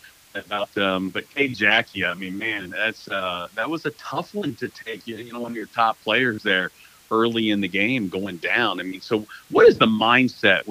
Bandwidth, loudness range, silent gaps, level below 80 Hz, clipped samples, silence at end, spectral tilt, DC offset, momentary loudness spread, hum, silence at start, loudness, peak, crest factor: 15.5 kHz; 8 LU; none; -62 dBFS; under 0.1%; 0 s; -5 dB/octave; under 0.1%; 14 LU; none; 0.35 s; -22 LUFS; -2 dBFS; 22 dB